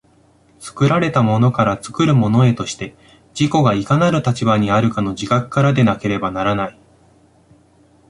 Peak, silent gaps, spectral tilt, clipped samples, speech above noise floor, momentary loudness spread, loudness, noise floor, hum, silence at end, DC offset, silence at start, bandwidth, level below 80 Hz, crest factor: -2 dBFS; none; -6.5 dB/octave; under 0.1%; 37 dB; 11 LU; -16 LUFS; -53 dBFS; none; 1.4 s; under 0.1%; 0.6 s; 11.5 kHz; -46 dBFS; 14 dB